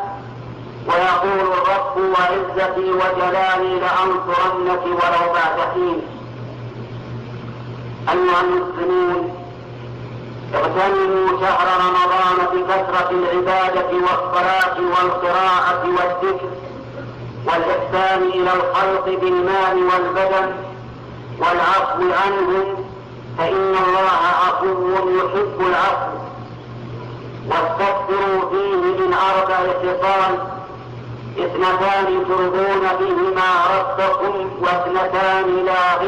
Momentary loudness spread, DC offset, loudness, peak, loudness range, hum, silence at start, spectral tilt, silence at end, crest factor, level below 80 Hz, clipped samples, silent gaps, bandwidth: 16 LU; under 0.1%; -17 LUFS; -8 dBFS; 4 LU; none; 0 s; -6 dB/octave; 0 s; 10 dB; -50 dBFS; under 0.1%; none; 8.8 kHz